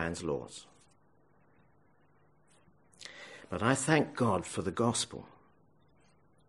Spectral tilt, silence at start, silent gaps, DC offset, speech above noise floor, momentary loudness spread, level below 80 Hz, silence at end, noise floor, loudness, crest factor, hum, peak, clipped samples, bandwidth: -4.5 dB/octave; 0 s; none; under 0.1%; 36 dB; 21 LU; -64 dBFS; 1.2 s; -68 dBFS; -32 LUFS; 24 dB; none; -12 dBFS; under 0.1%; 11.5 kHz